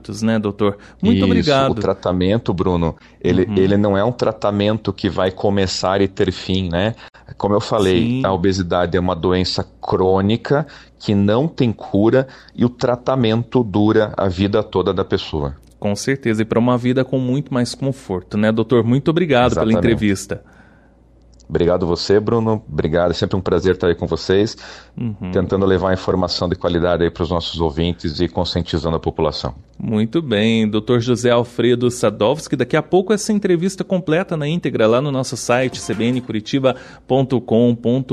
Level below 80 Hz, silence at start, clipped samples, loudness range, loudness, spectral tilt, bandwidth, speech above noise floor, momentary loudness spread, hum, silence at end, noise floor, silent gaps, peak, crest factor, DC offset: -40 dBFS; 0.05 s; under 0.1%; 2 LU; -18 LUFS; -6.5 dB/octave; 12.5 kHz; 32 dB; 6 LU; none; 0 s; -49 dBFS; none; -2 dBFS; 14 dB; under 0.1%